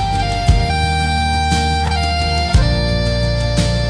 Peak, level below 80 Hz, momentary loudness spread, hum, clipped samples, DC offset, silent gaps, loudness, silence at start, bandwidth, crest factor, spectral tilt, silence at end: -2 dBFS; -20 dBFS; 2 LU; none; under 0.1%; under 0.1%; none; -16 LUFS; 0 s; 10.5 kHz; 14 dB; -5 dB/octave; 0 s